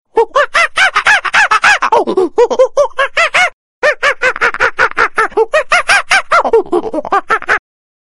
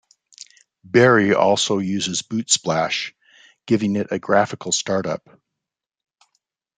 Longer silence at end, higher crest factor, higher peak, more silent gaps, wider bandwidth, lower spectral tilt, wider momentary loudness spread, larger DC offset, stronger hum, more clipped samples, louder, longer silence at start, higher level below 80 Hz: second, 0.4 s vs 1.6 s; second, 12 dB vs 20 dB; about the same, 0 dBFS vs -2 dBFS; first, 3.53-3.82 s vs none; first, 15 kHz vs 9.6 kHz; second, -1.5 dB/octave vs -3.5 dB/octave; second, 6 LU vs 10 LU; first, 0.5% vs under 0.1%; neither; neither; first, -10 LUFS vs -19 LUFS; second, 0.15 s vs 0.95 s; first, -42 dBFS vs -64 dBFS